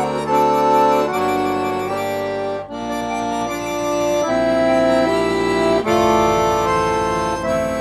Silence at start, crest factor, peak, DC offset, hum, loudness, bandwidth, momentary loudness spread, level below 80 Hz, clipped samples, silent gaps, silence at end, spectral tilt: 0 s; 14 dB; -2 dBFS; under 0.1%; none; -18 LUFS; 15.5 kHz; 8 LU; -42 dBFS; under 0.1%; none; 0 s; -5 dB/octave